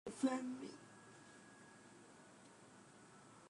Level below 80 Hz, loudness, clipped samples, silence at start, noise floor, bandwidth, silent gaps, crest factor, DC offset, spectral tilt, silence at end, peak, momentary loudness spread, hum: -86 dBFS; -44 LUFS; under 0.1%; 0.05 s; -63 dBFS; 11 kHz; none; 24 dB; under 0.1%; -4.5 dB/octave; 0 s; -26 dBFS; 22 LU; none